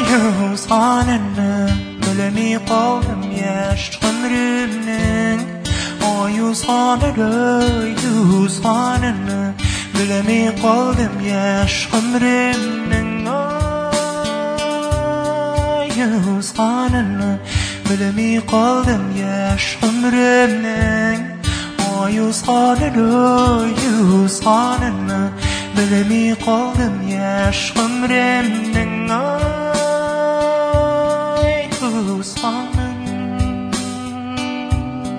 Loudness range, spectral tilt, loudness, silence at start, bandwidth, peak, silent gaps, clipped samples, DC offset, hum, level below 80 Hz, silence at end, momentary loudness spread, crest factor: 3 LU; -5 dB/octave; -17 LUFS; 0 s; 11 kHz; 0 dBFS; none; under 0.1%; under 0.1%; none; -32 dBFS; 0 s; 7 LU; 16 dB